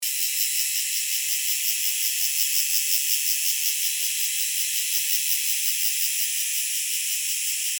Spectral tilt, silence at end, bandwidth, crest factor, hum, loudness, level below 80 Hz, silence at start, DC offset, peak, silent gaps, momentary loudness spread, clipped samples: 12 dB/octave; 0 s; 19.5 kHz; 18 dB; none; -21 LUFS; under -90 dBFS; 0 s; under 0.1%; -6 dBFS; none; 3 LU; under 0.1%